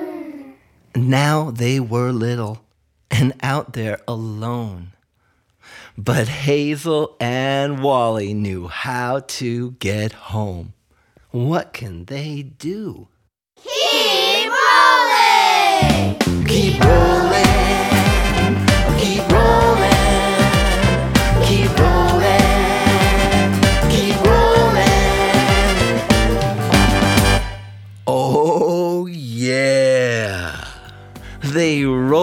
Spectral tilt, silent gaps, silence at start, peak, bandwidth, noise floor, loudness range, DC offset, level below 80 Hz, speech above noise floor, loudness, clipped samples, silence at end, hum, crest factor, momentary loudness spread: -5 dB/octave; none; 0 s; 0 dBFS; 17.5 kHz; -63 dBFS; 11 LU; under 0.1%; -26 dBFS; 44 dB; -16 LUFS; under 0.1%; 0 s; none; 16 dB; 14 LU